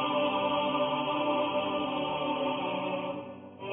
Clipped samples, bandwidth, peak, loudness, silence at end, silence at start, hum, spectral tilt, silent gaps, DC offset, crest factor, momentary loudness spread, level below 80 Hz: under 0.1%; 3.8 kHz; -16 dBFS; -30 LUFS; 0 s; 0 s; none; -9 dB/octave; none; under 0.1%; 14 dB; 9 LU; -66 dBFS